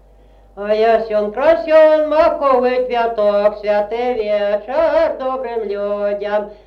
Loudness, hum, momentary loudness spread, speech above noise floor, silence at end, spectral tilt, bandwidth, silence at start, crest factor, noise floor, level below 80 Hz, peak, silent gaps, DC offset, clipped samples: -16 LUFS; none; 9 LU; 31 dB; 0.15 s; -6 dB/octave; 6 kHz; 0.55 s; 14 dB; -46 dBFS; -46 dBFS; -2 dBFS; none; under 0.1%; under 0.1%